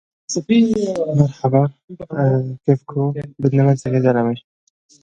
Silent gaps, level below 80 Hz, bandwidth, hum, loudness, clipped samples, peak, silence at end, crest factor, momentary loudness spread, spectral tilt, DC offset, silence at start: 1.84-1.88 s; -54 dBFS; 8.6 kHz; none; -18 LUFS; under 0.1%; 0 dBFS; 0.65 s; 18 dB; 9 LU; -7.5 dB/octave; under 0.1%; 0.3 s